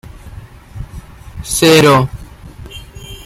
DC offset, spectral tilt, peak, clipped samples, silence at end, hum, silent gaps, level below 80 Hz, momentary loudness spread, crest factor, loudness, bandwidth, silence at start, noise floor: under 0.1%; -4.5 dB/octave; 0 dBFS; under 0.1%; 0.1 s; none; none; -34 dBFS; 27 LU; 16 dB; -10 LUFS; 16.5 kHz; 0.05 s; -34 dBFS